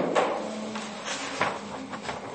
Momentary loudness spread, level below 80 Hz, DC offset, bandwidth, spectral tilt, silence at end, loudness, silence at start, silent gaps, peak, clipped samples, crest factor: 9 LU; -68 dBFS; under 0.1%; 8.8 kHz; -3.5 dB/octave; 0 s; -31 LUFS; 0 s; none; -10 dBFS; under 0.1%; 22 dB